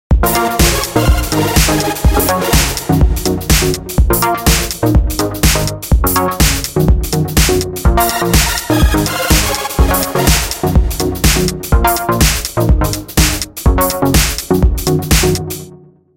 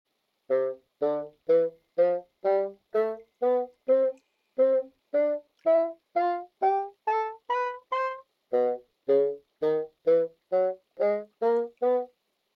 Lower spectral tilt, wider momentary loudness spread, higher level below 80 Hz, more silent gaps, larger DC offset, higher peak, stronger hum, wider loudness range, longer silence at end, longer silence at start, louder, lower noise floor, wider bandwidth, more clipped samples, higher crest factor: second, -4 dB/octave vs -7 dB/octave; second, 3 LU vs 6 LU; first, -16 dBFS vs -82 dBFS; neither; neither; first, 0 dBFS vs -14 dBFS; neither; about the same, 1 LU vs 2 LU; about the same, 0.4 s vs 0.5 s; second, 0.1 s vs 0.5 s; first, -13 LUFS vs -28 LUFS; second, -39 dBFS vs -61 dBFS; first, 17.5 kHz vs 5.6 kHz; neither; about the same, 12 dB vs 14 dB